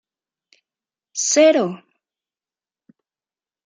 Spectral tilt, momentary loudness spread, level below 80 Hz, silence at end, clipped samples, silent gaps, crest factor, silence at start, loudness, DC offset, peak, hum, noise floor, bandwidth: -2.5 dB/octave; 18 LU; -80 dBFS; 1.9 s; under 0.1%; none; 20 dB; 1.15 s; -17 LUFS; under 0.1%; -2 dBFS; none; under -90 dBFS; 9.6 kHz